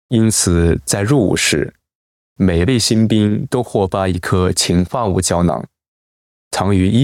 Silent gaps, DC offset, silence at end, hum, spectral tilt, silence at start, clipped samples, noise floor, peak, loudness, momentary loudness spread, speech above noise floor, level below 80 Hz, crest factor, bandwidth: 1.95-2.36 s, 5.88-6.51 s; under 0.1%; 0 s; none; -5 dB/octave; 0.1 s; under 0.1%; under -90 dBFS; -2 dBFS; -15 LUFS; 6 LU; over 76 dB; -38 dBFS; 12 dB; 17 kHz